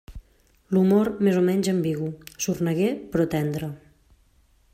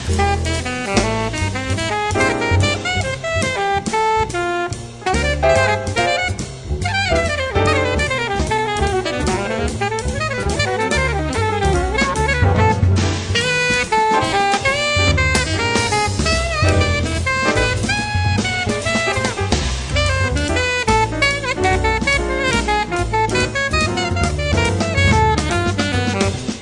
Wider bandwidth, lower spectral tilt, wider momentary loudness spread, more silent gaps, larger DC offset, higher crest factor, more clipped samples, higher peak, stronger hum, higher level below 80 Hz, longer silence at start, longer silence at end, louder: first, 16 kHz vs 11.5 kHz; first, -6.5 dB/octave vs -4.5 dB/octave; first, 11 LU vs 5 LU; neither; neither; about the same, 16 dB vs 16 dB; neither; second, -8 dBFS vs -2 dBFS; neither; second, -52 dBFS vs -28 dBFS; about the same, 0.1 s vs 0 s; first, 0.95 s vs 0 s; second, -24 LUFS vs -17 LUFS